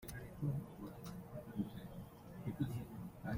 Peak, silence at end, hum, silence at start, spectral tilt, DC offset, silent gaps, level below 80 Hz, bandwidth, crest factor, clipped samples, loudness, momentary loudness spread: -28 dBFS; 0 s; none; 0 s; -7.5 dB/octave; under 0.1%; none; -62 dBFS; 16 kHz; 18 dB; under 0.1%; -47 LUFS; 9 LU